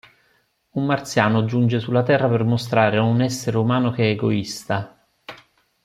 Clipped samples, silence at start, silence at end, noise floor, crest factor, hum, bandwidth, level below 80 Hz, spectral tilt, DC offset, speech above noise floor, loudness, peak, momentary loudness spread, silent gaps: under 0.1%; 0.75 s; 0.5 s; -64 dBFS; 18 dB; none; 14.5 kHz; -58 dBFS; -6.5 dB/octave; under 0.1%; 45 dB; -20 LUFS; -2 dBFS; 10 LU; none